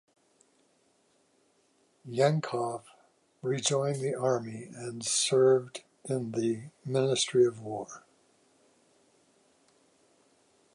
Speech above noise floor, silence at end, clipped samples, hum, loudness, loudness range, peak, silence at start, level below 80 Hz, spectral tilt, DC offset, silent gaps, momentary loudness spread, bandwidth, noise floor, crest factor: 40 dB; 2.75 s; under 0.1%; none; -29 LUFS; 7 LU; -12 dBFS; 2.05 s; -78 dBFS; -4.5 dB/octave; under 0.1%; none; 16 LU; 11.5 kHz; -69 dBFS; 20 dB